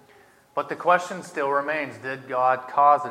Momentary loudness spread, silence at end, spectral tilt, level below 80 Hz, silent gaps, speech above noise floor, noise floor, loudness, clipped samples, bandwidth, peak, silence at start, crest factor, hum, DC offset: 13 LU; 0 s; -4.5 dB/octave; -78 dBFS; none; 32 dB; -55 dBFS; -24 LUFS; under 0.1%; 13.5 kHz; -4 dBFS; 0.55 s; 20 dB; none; under 0.1%